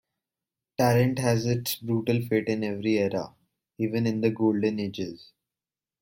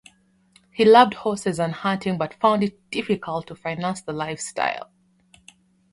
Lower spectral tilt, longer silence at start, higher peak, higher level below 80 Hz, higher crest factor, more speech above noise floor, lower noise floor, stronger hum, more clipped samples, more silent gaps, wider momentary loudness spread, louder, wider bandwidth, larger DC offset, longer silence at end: first, -6.5 dB/octave vs -5 dB/octave; about the same, 0.8 s vs 0.75 s; second, -10 dBFS vs -2 dBFS; about the same, -62 dBFS vs -62 dBFS; about the same, 18 dB vs 22 dB; first, over 65 dB vs 37 dB; first, under -90 dBFS vs -59 dBFS; neither; neither; neither; second, 10 LU vs 15 LU; second, -26 LUFS vs -22 LUFS; first, 16.5 kHz vs 11.5 kHz; neither; second, 0.85 s vs 1.1 s